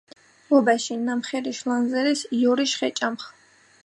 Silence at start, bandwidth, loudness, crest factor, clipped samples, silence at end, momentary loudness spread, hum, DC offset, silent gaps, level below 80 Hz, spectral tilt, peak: 0.5 s; 11.5 kHz; -23 LUFS; 20 dB; under 0.1%; 0.55 s; 9 LU; none; under 0.1%; none; -78 dBFS; -3 dB/octave; -4 dBFS